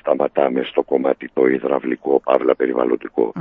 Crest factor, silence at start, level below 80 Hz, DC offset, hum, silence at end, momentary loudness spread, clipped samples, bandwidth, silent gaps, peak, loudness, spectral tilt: 18 dB; 0.05 s; -64 dBFS; under 0.1%; none; 0 s; 4 LU; under 0.1%; 4 kHz; none; 0 dBFS; -19 LUFS; -9 dB/octave